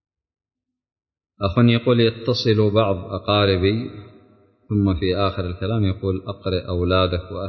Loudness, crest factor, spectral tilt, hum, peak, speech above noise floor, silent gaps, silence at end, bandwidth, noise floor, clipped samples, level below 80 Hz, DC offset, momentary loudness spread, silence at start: -20 LUFS; 16 dB; -8 dB/octave; none; -4 dBFS; 35 dB; none; 0 s; 6.4 kHz; -54 dBFS; under 0.1%; -36 dBFS; under 0.1%; 9 LU; 1.4 s